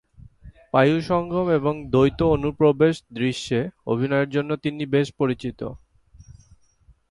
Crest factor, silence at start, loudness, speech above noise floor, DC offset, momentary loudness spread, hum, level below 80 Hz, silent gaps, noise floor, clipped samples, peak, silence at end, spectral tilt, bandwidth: 18 dB; 0.45 s; -22 LUFS; 36 dB; under 0.1%; 8 LU; none; -46 dBFS; none; -57 dBFS; under 0.1%; -4 dBFS; 1.35 s; -7 dB/octave; 11.5 kHz